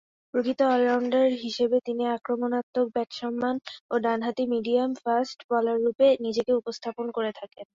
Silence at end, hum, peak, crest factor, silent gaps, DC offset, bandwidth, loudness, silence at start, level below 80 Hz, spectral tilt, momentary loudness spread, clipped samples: 0.15 s; none; -12 dBFS; 14 dB; 2.63-2.73 s, 3.80-3.89 s, 5.44-5.49 s; under 0.1%; 7.6 kHz; -26 LUFS; 0.35 s; -72 dBFS; -5 dB/octave; 9 LU; under 0.1%